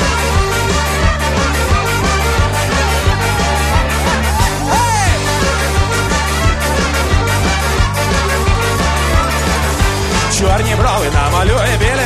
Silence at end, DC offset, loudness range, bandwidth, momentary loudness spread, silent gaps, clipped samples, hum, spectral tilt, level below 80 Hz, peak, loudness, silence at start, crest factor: 0 s; under 0.1%; 0 LU; 13.5 kHz; 2 LU; none; under 0.1%; none; -4 dB/octave; -18 dBFS; 0 dBFS; -14 LUFS; 0 s; 12 dB